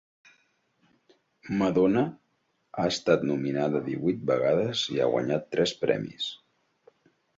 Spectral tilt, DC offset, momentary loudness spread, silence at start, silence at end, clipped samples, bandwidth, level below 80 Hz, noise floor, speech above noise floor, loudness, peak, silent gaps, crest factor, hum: -5.5 dB/octave; under 0.1%; 9 LU; 1.45 s; 1.05 s; under 0.1%; 7.8 kHz; -64 dBFS; -73 dBFS; 47 dB; -27 LUFS; -8 dBFS; none; 20 dB; none